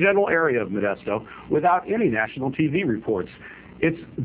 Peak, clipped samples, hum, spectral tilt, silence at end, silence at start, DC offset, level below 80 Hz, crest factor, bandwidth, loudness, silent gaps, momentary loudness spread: -6 dBFS; under 0.1%; none; -10.5 dB/octave; 0 s; 0 s; under 0.1%; -54 dBFS; 18 dB; 4 kHz; -23 LUFS; none; 9 LU